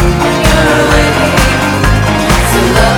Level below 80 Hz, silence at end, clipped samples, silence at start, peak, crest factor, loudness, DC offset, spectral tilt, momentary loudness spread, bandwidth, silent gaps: -16 dBFS; 0 s; 0.4%; 0 s; 0 dBFS; 8 dB; -9 LUFS; under 0.1%; -4.5 dB/octave; 2 LU; 19.5 kHz; none